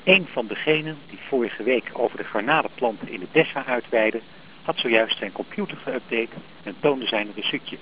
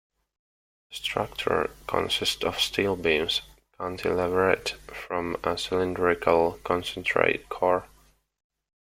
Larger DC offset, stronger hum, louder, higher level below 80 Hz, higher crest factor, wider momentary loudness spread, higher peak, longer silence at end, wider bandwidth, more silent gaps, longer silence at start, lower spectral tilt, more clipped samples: first, 0.4% vs under 0.1%; neither; about the same, -24 LUFS vs -26 LUFS; second, -68 dBFS vs -54 dBFS; about the same, 22 dB vs 24 dB; first, 12 LU vs 8 LU; about the same, -2 dBFS vs -2 dBFS; second, 0 s vs 1.05 s; second, 4 kHz vs 16.5 kHz; neither; second, 0 s vs 0.9 s; first, -8.5 dB/octave vs -4 dB/octave; neither